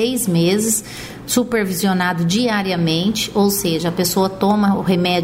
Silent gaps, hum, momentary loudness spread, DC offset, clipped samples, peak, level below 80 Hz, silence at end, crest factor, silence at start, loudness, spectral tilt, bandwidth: none; none; 4 LU; under 0.1%; under 0.1%; -4 dBFS; -46 dBFS; 0 s; 14 dB; 0 s; -17 LUFS; -4.5 dB/octave; 16.5 kHz